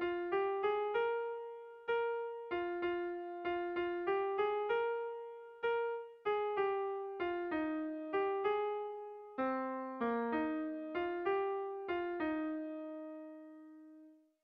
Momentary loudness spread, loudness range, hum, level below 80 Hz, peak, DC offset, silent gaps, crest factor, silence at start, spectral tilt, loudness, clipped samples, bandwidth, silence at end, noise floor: 12 LU; 2 LU; none; -74 dBFS; -24 dBFS; under 0.1%; none; 14 dB; 0 s; -2.5 dB/octave; -38 LUFS; under 0.1%; 5.6 kHz; 0.3 s; -61 dBFS